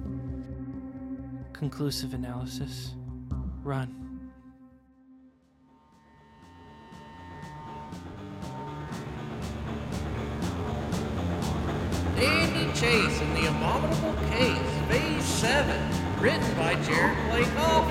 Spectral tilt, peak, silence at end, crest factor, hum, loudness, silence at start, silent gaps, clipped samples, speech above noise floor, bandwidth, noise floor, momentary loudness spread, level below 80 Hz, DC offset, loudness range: -5 dB/octave; -8 dBFS; 0 s; 22 dB; none; -28 LUFS; 0 s; none; under 0.1%; 34 dB; 16.5 kHz; -61 dBFS; 18 LU; -40 dBFS; under 0.1%; 17 LU